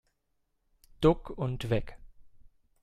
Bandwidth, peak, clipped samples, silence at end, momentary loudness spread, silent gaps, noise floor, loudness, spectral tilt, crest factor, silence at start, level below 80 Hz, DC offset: 14 kHz; -10 dBFS; under 0.1%; 0.4 s; 9 LU; none; -77 dBFS; -30 LUFS; -8 dB/octave; 24 dB; 1 s; -46 dBFS; under 0.1%